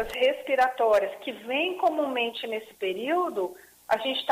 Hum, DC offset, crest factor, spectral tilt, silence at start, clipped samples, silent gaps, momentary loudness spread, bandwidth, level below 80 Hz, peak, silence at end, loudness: none; under 0.1%; 16 dB; -3 dB/octave; 0 s; under 0.1%; none; 10 LU; 15.5 kHz; -62 dBFS; -12 dBFS; 0 s; -27 LUFS